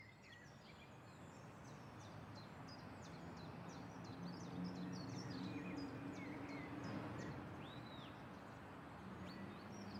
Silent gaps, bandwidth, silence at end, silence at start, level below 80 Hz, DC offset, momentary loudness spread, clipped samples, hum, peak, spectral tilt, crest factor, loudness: none; 16 kHz; 0 s; 0 s; -74 dBFS; under 0.1%; 10 LU; under 0.1%; none; -36 dBFS; -6 dB/octave; 16 dB; -53 LUFS